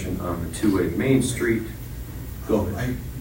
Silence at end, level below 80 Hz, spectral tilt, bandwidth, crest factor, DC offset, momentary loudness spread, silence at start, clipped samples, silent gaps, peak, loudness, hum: 0 s; -38 dBFS; -6 dB/octave; 16.5 kHz; 18 dB; under 0.1%; 14 LU; 0 s; under 0.1%; none; -6 dBFS; -24 LUFS; none